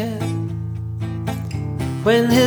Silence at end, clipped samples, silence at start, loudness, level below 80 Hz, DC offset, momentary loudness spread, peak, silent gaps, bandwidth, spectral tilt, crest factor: 0 s; under 0.1%; 0 s; -22 LUFS; -40 dBFS; under 0.1%; 10 LU; -4 dBFS; none; over 20 kHz; -6 dB/octave; 16 dB